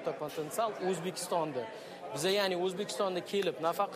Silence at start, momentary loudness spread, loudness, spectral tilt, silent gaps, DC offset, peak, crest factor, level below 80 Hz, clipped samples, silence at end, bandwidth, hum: 0 s; 9 LU; -34 LUFS; -4 dB/octave; none; under 0.1%; -18 dBFS; 16 dB; -80 dBFS; under 0.1%; 0 s; 15.5 kHz; none